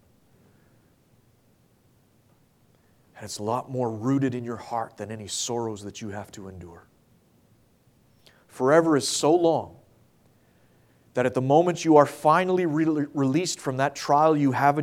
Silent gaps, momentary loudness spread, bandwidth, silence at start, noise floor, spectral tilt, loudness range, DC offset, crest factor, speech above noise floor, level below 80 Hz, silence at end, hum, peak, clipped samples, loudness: none; 17 LU; 16 kHz; 3.15 s; -62 dBFS; -5 dB/octave; 13 LU; under 0.1%; 22 dB; 39 dB; -68 dBFS; 0 s; none; -4 dBFS; under 0.1%; -23 LUFS